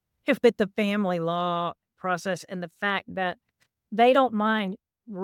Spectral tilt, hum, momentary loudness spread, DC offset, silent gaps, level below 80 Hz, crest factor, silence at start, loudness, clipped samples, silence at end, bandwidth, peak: -6 dB/octave; none; 14 LU; under 0.1%; none; -70 dBFS; 18 dB; 0.25 s; -26 LUFS; under 0.1%; 0 s; 16.5 kHz; -8 dBFS